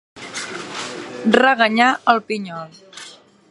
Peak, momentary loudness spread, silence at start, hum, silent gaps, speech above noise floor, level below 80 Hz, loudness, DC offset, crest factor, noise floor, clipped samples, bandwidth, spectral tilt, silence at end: 0 dBFS; 23 LU; 0.15 s; none; none; 26 dB; -62 dBFS; -18 LUFS; under 0.1%; 20 dB; -42 dBFS; under 0.1%; 11.5 kHz; -3.5 dB/octave; 0.4 s